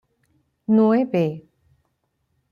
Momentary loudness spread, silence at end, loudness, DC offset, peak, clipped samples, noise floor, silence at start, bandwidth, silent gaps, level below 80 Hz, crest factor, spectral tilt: 19 LU; 1.1 s; -20 LUFS; under 0.1%; -8 dBFS; under 0.1%; -72 dBFS; 0.7 s; 5.4 kHz; none; -68 dBFS; 16 dB; -9.5 dB/octave